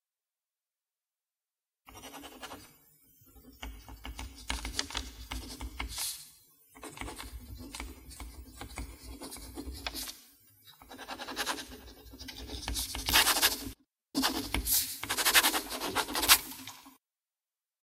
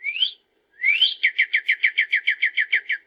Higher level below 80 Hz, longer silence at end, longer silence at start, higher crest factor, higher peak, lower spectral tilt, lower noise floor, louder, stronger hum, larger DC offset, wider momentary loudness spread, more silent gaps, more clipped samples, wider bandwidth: first, -48 dBFS vs -88 dBFS; first, 0.9 s vs 0.1 s; first, 1.9 s vs 0 s; first, 32 dB vs 16 dB; about the same, -4 dBFS vs -6 dBFS; first, -1 dB/octave vs 3 dB/octave; first, under -90 dBFS vs -51 dBFS; second, -30 LUFS vs -19 LUFS; neither; neither; first, 24 LU vs 6 LU; neither; neither; first, 16 kHz vs 7.4 kHz